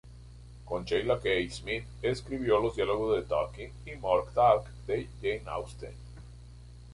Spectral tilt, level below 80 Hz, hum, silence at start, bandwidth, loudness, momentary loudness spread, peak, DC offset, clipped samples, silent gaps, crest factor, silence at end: -6 dB/octave; -48 dBFS; 60 Hz at -45 dBFS; 0.05 s; 11.5 kHz; -30 LUFS; 24 LU; -12 dBFS; under 0.1%; under 0.1%; none; 20 dB; 0 s